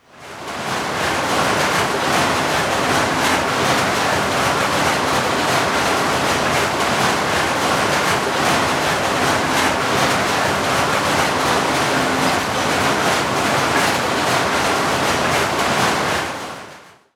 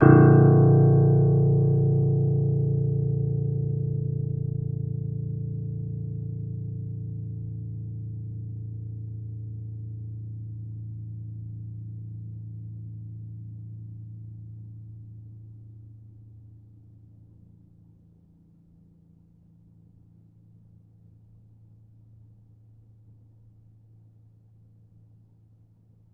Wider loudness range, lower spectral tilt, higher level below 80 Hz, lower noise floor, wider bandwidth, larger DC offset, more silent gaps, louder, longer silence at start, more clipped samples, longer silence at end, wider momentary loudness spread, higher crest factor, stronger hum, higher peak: second, 0 LU vs 23 LU; second, -3 dB/octave vs -13 dB/octave; first, -44 dBFS vs -50 dBFS; second, -42 dBFS vs -57 dBFS; first, over 20 kHz vs 2.8 kHz; neither; neither; first, -17 LUFS vs -25 LUFS; first, 0.15 s vs 0 s; neither; second, 0.3 s vs 9.65 s; second, 2 LU vs 24 LU; second, 14 dB vs 24 dB; neither; about the same, -4 dBFS vs -2 dBFS